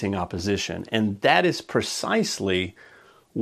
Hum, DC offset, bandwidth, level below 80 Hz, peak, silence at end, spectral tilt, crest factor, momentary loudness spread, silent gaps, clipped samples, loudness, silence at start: none; under 0.1%; 14.5 kHz; -56 dBFS; -4 dBFS; 0 s; -4 dB/octave; 22 dB; 8 LU; none; under 0.1%; -24 LUFS; 0 s